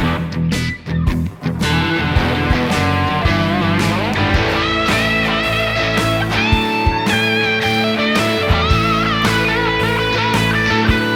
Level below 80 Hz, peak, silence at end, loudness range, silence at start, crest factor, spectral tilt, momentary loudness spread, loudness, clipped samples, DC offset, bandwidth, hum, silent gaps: -28 dBFS; -2 dBFS; 0 s; 2 LU; 0 s; 14 dB; -5 dB/octave; 4 LU; -15 LUFS; under 0.1%; under 0.1%; 17.5 kHz; none; none